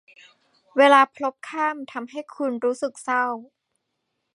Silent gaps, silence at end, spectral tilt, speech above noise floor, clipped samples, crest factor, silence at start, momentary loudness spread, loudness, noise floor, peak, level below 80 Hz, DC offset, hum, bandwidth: none; 0.9 s; -2.5 dB/octave; 55 dB; under 0.1%; 22 dB; 0.75 s; 18 LU; -22 LUFS; -77 dBFS; -2 dBFS; -82 dBFS; under 0.1%; none; 11.5 kHz